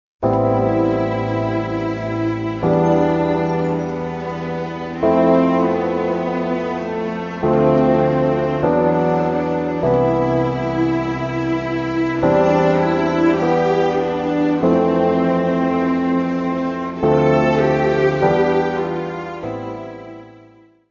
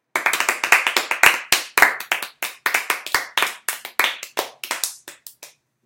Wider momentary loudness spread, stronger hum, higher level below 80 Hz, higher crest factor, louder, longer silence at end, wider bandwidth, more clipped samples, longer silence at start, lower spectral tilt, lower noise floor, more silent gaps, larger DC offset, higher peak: second, 10 LU vs 13 LU; neither; first, -44 dBFS vs -62 dBFS; second, 16 dB vs 22 dB; about the same, -18 LUFS vs -19 LUFS; first, 0.6 s vs 0.4 s; second, 7.2 kHz vs 17.5 kHz; neither; about the same, 0.2 s vs 0.15 s; first, -8 dB/octave vs 1 dB/octave; about the same, -48 dBFS vs -47 dBFS; neither; neither; about the same, -2 dBFS vs 0 dBFS